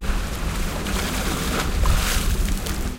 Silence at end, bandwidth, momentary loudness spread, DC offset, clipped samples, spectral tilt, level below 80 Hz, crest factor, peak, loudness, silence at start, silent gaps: 0 s; 17 kHz; 5 LU; under 0.1%; under 0.1%; -4 dB/octave; -24 dBFS; 16 dB; -6 dBFS; -24 LUFS; 0 s; none